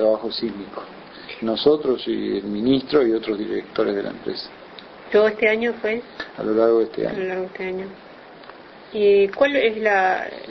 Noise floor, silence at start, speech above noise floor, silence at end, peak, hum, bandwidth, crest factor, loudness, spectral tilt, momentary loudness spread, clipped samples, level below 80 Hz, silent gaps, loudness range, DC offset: -42 dBFS; 0 s; 21 dB; 0 s; -4 dBFS; none; 6 kHz; 18 dB; -21 LUFS; -6.5 dB/octave; 19 LU; under 0.1%; -58 dBFS; none; 2 LU; under 0.1%